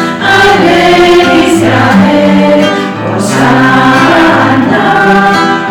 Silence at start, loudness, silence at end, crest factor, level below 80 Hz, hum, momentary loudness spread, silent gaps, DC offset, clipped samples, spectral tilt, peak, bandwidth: 0 s; -6 LUFS; 0 s; 6 dB; -36 dBFS; none; 4 LU; none; under 0.1%; under 0.1%; -5 dB/octave; 0 dBFS; 18.5 kHz